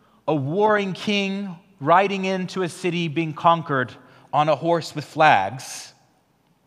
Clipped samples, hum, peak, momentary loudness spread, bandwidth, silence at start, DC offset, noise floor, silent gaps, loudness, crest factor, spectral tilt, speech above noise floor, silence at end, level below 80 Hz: under 0.1%; none; 0 dBFS; 13 LU; 14.5 kHz; 0.25 s; under 0.1%; -63 dBFS; none; -21 LUFS; 22 dB; -5.5 dB/octave; 42 dB; 0.8 s; -74 dBFS